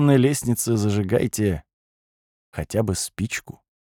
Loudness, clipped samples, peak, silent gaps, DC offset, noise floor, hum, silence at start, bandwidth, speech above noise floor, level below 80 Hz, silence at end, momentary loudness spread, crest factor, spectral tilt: -23 LUFS; under 0.1%; -4 dBFS; 1.73-2.53 s; under 0.1%; under -90 dBFS; none; 0 s; 18.5 kHz; over 69 dB; -48 dBFS; 0.5 s; 12 LU; 18 dB; -5.5 dB/octave